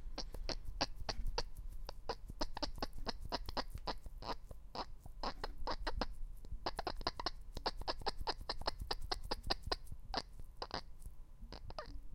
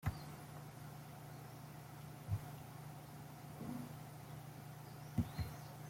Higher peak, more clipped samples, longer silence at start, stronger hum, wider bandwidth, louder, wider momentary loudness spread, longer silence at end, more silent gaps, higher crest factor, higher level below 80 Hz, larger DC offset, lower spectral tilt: first, -18 dBFS vs -26 dBFS; neither; about the same, 0 s vs 0 s; neither; about the same, 16 kHz vs 16.5 kHz; first, -45 LUFS vs -50 LUFS; about the same, 10 LU vs 9 LU; about the same, 0 s vs 0 s; neither; about the same, 24 dB vs 24 dB; first, -46 dBFS vs -62 dBFS; neither; second, -4 dB/octave vs -6 dB/octave